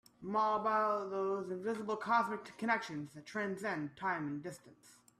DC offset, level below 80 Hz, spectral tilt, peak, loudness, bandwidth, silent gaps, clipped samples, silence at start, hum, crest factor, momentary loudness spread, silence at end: under 0.1%; -80 dBFS; -5.5 dB/octave; -18 dBFS; -37 LUFS; 14 kHz; none; under 0.1%; 0.2 s; none; 18 dB; 11 LU; 0.3 s